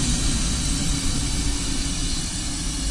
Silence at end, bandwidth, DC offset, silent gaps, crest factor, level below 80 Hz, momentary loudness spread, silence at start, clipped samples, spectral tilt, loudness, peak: 0 s; 11.5 kHz; under 0.1%; none; 12 dB; -26 dBFS; 4 LU; 0 s; under 0.1%; -3 dB/octave; -24 LUFS; -10 dBFS